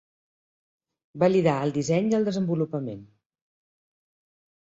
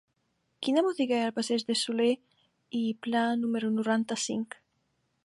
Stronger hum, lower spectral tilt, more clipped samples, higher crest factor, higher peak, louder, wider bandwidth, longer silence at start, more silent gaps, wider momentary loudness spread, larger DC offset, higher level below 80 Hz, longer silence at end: neither; first, -7 dB/octave vs -3.5 dB/octave; neither; about the same, 20 dB vs 16 dB; first, -8 dBFS vs -14 dBFS; first, -25 LUFS vs -29 LUFS; second, 8 kHz vs 11.5 kHz; first, 1.15 s vs 0.6 s; neither; first, 12 LU vs 9 LU; neither; first, -66 dBFS vs -80 dBFS; first, 1.65 s vs 0.8 s